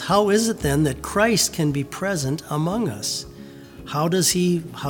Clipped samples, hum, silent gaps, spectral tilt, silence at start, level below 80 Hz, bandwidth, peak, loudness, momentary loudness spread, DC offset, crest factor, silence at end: under 0.1%; none; none; -4 dB/octave; 0 s; -44 dBFS; over 20 kHz; -4 dBFS; -21 LUFS; 11 LU; under 0.1%; 18 dB; 0 s